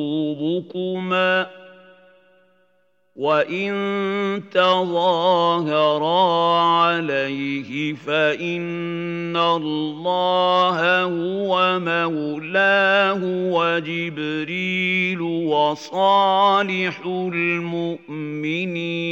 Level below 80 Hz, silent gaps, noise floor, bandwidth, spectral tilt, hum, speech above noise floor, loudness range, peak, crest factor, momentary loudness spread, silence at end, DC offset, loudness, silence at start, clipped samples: -82 dBFS; none; -65 dBFS; 7.8 kHz; -6 dB/octave; none; 45 dB; 5 LU; -4 dBFS; 16 dB; 9 LU; 0 s; under 0.1%; -20 LUFS; 0 s; under 0.1%